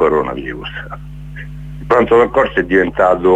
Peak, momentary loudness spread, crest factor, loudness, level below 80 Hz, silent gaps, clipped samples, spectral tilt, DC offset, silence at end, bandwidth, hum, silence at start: 0 dBFS; 19 LU; 14 dB; -14 LUFS; -34 dBFS; none; under 0.1%; -7.5 dB/octave; under 0.1%; 0 s; 8 kHz; 50 Hz at -30 dBFS; 0 s